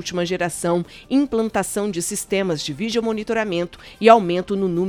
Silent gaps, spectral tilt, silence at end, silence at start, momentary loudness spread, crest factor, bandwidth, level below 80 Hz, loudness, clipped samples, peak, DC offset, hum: none; -4.5 dB/octave; 0 s; 0 s; 10 LU; 20 dB; 18 kHz; -50 dBFS; -20 LUFS; under 0.1%; 0 dBFS; under 0.1%; none